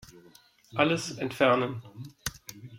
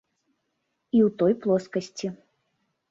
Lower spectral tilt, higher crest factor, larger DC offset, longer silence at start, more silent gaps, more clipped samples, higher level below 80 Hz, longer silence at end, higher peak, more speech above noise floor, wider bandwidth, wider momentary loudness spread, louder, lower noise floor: second, -4.5 dB/octave vs -7 dB/octave; first, 24 dB vs 16 dB; neither; second, 0.15 s vs 0.95 s; neither; neither; first, -60 dBFS vs -70 dBFS; second, 0 s vs 0.75 s; about the same, -8 dBFS vs -10 dBFS; second, 30 dB vs 54 dB; first, 16.5 kHz vs 7.8 kHz; first, 18 LU vs 13 LU; second, -28 LUFS vs -25 LUFS; second, -58 dBFS vs -77 dBFS